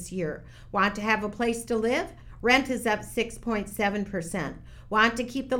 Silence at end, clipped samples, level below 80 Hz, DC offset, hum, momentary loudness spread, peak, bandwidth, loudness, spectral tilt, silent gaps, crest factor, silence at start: 0 s; under 0.1%; -48 dBFS; under 0.1%; none; 11 LU; -6 dBFS; 17.5 kHz; -27 LUFS; -4 dB/octave; none; 20 dB; 0 s